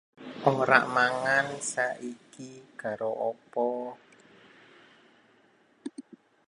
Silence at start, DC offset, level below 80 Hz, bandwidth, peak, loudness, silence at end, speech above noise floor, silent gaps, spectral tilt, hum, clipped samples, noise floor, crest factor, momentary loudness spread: 0.2 s; under 0.1%; -78 dBFS; 11.5 kHz; -4 dBFS; -28 LUFS; 0.45 s; 35 dB; none; -4 dB/octave; none; under 0.1%; -64 dBFS; 26 dB; 23 LU